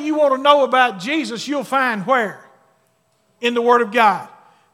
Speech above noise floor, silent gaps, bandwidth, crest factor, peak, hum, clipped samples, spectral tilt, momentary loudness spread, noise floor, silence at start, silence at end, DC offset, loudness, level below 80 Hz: 46 dB; none; 15.5 kHz; 18 dB; 0 dBFS; none; under 0.1%; -4 dB/octave; 10 LU; -62 dBFS; 0 s; 0.45 s; under 0.1%; -17 LUFS; -82 dBFS